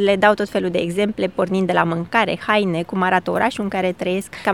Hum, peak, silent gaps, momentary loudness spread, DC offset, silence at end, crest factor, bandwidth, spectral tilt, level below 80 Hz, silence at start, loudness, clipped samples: none; 0 dBFS; none; 5 LU; 0.2%; 0 s; 18 dB; 16.5 kHz; -6 dB/octave; -54 dBFS; 0 s; -19 LUFS; under 0.1%